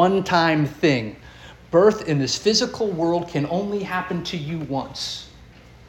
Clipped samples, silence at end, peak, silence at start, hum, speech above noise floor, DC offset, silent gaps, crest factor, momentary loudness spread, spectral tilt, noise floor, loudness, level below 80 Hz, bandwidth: under 0.1%; 0.45 s; -4 dBFS; 0 s; none; 25 dB; under 0.1%; none; 18 dB; 11 LU; -5 dB/octave; -46 dBFS; -22 LUFS; -50 dBFS; 17 kHz